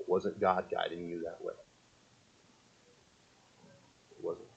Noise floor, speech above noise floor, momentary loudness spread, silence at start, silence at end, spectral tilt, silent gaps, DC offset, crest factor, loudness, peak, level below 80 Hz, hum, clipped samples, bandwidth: -65 dBFS; 30 dB; 13 LU; 0 s; 0.1 s; -6 dB/octave; none; under 0.1%; 24 dB; -36 LUFS; -14 dBFS; -76 dBFS; none; under 0.1%; 8.4 kHz